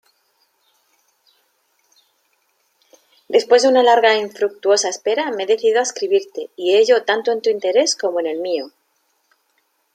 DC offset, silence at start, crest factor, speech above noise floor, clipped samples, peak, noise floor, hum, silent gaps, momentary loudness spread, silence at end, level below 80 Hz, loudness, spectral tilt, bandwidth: under 0.1%; 3.3 s; 18 dB; 49 dB; under 0.1%; -2 dBFS; -66 dBFS; none; none; 10 LU; 1.25 s; -76 dBFS; -17 LUFS; -1.5 dB/octave; 10.5 kHz